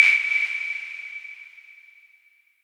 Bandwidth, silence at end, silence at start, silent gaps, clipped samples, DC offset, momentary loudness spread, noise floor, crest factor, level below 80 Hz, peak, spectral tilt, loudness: 13 kHz; 0.95 s; 0 s; none; under 0.1%; under 0.1%; 23 LU; -60 dBFS; 24 dB; -82 dBFS; -2 dBFS; 3.5 dB/octave; -22 LUFS